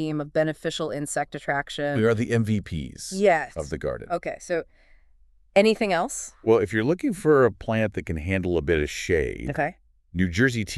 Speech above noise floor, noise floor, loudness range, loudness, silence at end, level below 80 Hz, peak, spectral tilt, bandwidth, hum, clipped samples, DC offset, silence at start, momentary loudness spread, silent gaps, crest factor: 34 dB; -58 dBFS; 3 LU; -25 LUFS; 0 s; -44 dBFS; -6 dBFS; -5.5 dB/octave; 13 kHz; none; under 0.1%; under 0.1%; 0 s; 10 LU; none; 20 dB